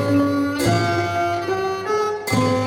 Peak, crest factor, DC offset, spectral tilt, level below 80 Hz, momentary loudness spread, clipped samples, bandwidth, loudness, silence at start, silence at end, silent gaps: -6 dBFS; 14 dB; under 0.1%; -5.5 dB/octave; -50 dBFS; 4 LU; under 0.1%; 16.5 kHz; -20 LUFS; 0 s; 0 s; none